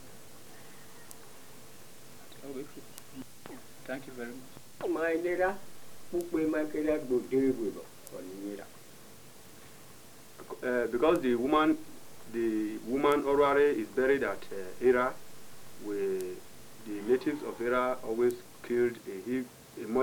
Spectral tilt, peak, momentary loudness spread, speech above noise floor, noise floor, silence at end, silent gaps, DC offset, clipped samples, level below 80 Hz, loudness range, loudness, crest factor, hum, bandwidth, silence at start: -5 dB/octave; -12 dBFS; 25 LU; 23 dB; -54 dBFS; 0 s; none; 0.3%; under 0.1%; -60 dBFS; 16 LU; -31 LUFS; 20 dB; none; over 20 kHz; 0 s